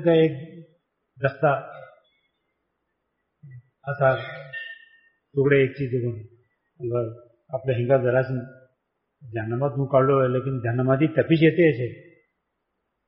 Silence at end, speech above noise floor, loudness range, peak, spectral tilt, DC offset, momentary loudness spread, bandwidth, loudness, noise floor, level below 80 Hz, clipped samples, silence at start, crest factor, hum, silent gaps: 1.05 s; 56 dB; 9 LU; -6 dBFS; -6.5 dB/octave; under 0.1%; 16 LU; 5.4 kHz; -23 LUFS; -78 dBFS; -60 dBFS; under 0.1%; 0 s; 18 dB; none; none